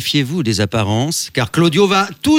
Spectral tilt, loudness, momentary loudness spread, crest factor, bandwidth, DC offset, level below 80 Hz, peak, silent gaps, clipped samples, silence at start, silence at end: -5 dB/octave; -15 LUFS; 5 LU; 12 dB; 17 kHz; under 0.1%; -50 dBFS; -2 dBFS; none; under 0.1%; 0 s; 0 s